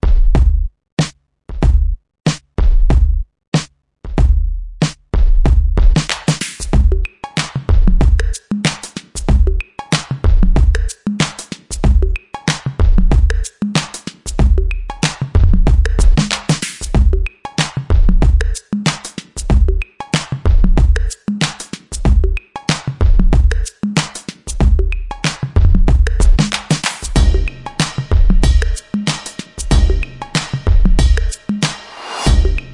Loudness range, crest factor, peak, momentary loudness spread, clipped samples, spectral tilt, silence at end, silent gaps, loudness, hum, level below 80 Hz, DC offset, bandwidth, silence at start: 2 LU; 12 dB; 0 dBFS; 9 LU; under 0.1%; -5 dB/octave; 0 s; 0.92-0.97 s, 3.48-3.52 s; -17 LUFS; none; -14 dBFS; under 0.1%; 11.5 kHz; 0.05 s